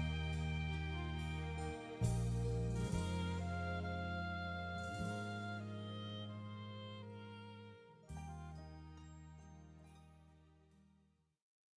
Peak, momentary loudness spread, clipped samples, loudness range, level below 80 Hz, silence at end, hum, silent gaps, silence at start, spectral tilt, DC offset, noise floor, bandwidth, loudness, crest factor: -26 dBFS; 18 LU; under 0.1%; 15 LU; -52 dBFS; 1.25 s; none; none; 0 s; -6.5 dB/octave; under 0.1%; -76 dBFS; 11 kHz; -44 LUFS; 18 dB